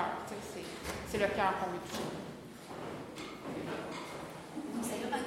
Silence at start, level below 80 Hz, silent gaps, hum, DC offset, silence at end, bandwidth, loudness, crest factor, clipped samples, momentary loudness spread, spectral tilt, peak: 0 s; -60 dBFS; none; none; under 0.1%; 0 s; 16 kHz; -39 LUFS; 22 dB; under 0.1%; 12 LU; -4.5 dB/octave; -18 dBFS